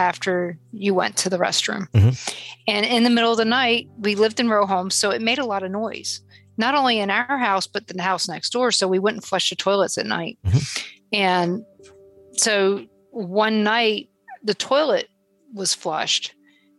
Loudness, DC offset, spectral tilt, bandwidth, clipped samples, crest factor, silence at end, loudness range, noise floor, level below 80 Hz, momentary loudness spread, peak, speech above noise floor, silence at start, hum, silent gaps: -21 LUFS; under 0.1%; -3.5 dB/octave; 12.5 kHz; under 0.1%; 16 dB; 0.5 s; 3 LU; -48 dBFS; -52 dBFS; 10 LU; -6 dBFS; 28 dB; 0 s; none; none